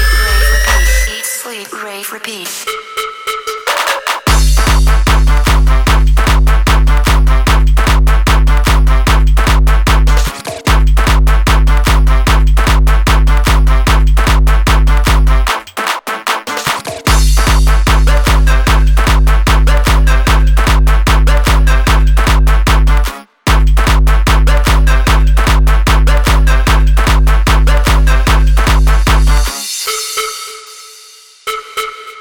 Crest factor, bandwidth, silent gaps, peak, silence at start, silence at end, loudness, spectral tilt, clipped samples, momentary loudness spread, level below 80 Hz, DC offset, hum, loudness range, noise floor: 8 dB; 19 kHz; none; 0 dBFS; 0 s; 0 s; -11 LUFS; -4.5 dB/octave; under 0.1%; 8 LU; -10 dBFS; under 0.1%; none; 3 LU; -38 dBFS